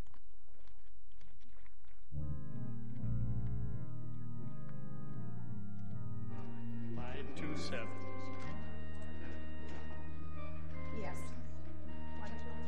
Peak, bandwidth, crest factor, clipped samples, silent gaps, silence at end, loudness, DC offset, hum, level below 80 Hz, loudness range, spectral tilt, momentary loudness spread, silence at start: -24 dBFS; 8.8 kHz; 16 dB; under 0.1%; none; 0 s; -46 LUFS; 3%; none; -52 dBFS; 3 LU; -7 dB/octave; 8 LU; 0.05 s